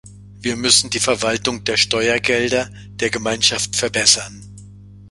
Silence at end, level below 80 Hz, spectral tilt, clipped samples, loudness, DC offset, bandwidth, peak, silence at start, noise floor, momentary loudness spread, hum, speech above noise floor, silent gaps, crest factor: 0 s; -48 dBFS; -1.5 dB/octave; under 0.1%; -17 LUFS; under 0.1%; 12 kHz; 0 dBFS; 0.05 s; -40 dBFS; 10 LU; 50 Hz at -35 dBFS; 22 dB; none; 20 dB